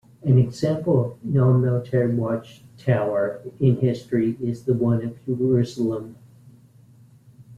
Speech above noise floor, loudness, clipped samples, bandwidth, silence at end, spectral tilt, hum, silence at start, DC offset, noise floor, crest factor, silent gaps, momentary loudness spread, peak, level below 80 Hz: 30 dB; -22 LUFS; under 0.1%; 7.8 kHz; 0 s; -9 dB/octave; none; 0.25 s; under 0.1%; -51 dBFS; 16 dB; none; 8 LU; -6 dBFS; -56 dBFS